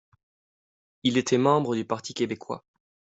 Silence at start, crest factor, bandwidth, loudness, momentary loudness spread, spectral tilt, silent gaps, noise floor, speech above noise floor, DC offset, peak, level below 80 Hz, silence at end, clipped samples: 1.05 s; 20 dB; 8.2 kHz; -26 LUFS; 14 LU; -5 dB/octave; none; under -90 dBFS; over 65 dB; under 0.1%; -8 dBFS; -68 dBFS; 0.5 s; under 0.1%